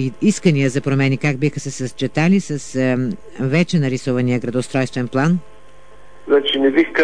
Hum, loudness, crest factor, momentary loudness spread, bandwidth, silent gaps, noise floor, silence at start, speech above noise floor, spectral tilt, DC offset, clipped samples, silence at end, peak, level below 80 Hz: none; -18 LUFS; 16 dB; 7 LU; 10.5 kHz; none; -46 dBFS; 0 s; 29 dB; -6 dB/octave; 2%; under 0.1%; 0 s; -2 dBFS; -52 dBFS